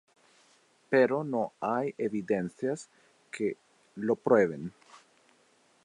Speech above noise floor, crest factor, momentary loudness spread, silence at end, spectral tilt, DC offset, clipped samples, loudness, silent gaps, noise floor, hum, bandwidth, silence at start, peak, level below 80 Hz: 37 dB; 22 dB; 17 LU; 0.85 s; -7 dB/octave; under 0.1%; under 0.1%; -30 LUFS; none; -66 dBFS; none; 11 kHz; 0.9 s; -10 dBFS; -74 dBFS